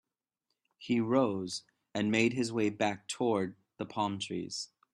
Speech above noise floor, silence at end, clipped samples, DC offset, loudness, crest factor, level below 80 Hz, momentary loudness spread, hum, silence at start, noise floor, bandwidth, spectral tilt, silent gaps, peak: 54 dB; 0.3 s; under 0.1%; under 0.1%; -33 LUFS; 20 dB; -74 dBFS; 12 LU; none; 0.8 s; -86 dBFS; 12 kHz; -5 dB/octave; none; -14 dBFS